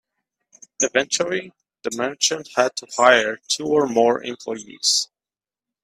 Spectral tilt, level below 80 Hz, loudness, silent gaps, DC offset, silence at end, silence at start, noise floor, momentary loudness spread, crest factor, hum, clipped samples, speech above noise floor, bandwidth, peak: -1.5 dB/octave; -68 dBFS; -20 LUFS; none; under 0.1%; 0.8 s; 0.8 s; under -90 dBFS; 14 LU; 22 dB; none; under 0.1%; over 70 dB; 15 kHz; 0 dBFS